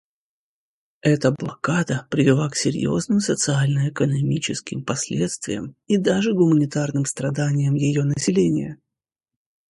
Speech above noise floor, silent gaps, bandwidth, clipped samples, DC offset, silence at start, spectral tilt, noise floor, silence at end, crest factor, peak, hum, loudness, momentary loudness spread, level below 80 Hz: over 69 dB; none; 11.5 kHz; under 0.1%; under 0.1%; 1.05 s; -5.5 dB/octave; under -90 dBFS; 1 s; 18 dB; -4 dBFS; none; -21 LUFS; 8 LU; -56 dBFS